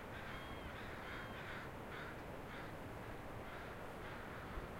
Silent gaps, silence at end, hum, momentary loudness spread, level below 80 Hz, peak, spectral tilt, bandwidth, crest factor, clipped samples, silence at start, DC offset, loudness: none; 0 s; none; 2 LU; -58 dBFS; -32 dBFS; -5.5 dB/octave; 16 kHz; 16 dB; under 0.1%; 0 s; under 0.1%; -50 LUFS